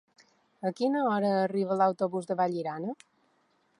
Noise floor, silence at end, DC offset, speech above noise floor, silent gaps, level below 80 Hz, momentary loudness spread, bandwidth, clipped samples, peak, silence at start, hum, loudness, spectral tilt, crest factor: -70 dBFS; 0.85 s; under 0.1%; 42 dB; none; -82 dBFS; 10 LU; 11.5 kHz; under 0.1%; -14 dBFS; 0.6 s; none; -29 LUFS; -7 dB/octave; 18 dB